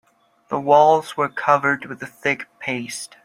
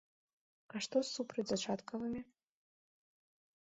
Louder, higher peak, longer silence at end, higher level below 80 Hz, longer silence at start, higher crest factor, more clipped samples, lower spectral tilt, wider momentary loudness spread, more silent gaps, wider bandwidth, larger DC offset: first, -19 LUFS vs -40 LUFS; first, -2 dBFS vs -22 dBFS; second, 0.2 s vs 1.4 s; first, -66 dBFS vs -76 dBFS; second, 0.5 s vs 0.75 s; about the same, 18 dB vs 22 dB; neither; about the same, -4.5 dB/octave vs -4 dB/octave; first, 13 LU vs 10 LU; neither; first, 16 kHz vs 8 kHz; neither